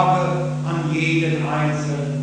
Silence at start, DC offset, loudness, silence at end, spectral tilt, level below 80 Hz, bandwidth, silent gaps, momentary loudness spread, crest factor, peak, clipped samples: 0 s; under 0.1%; -21 LUFS; 0 s; -6.5 dB/octave; -50 dBFS; 9.4 kHz; none; 5 LU; 18 dB; -2 dBFS; under 0.1%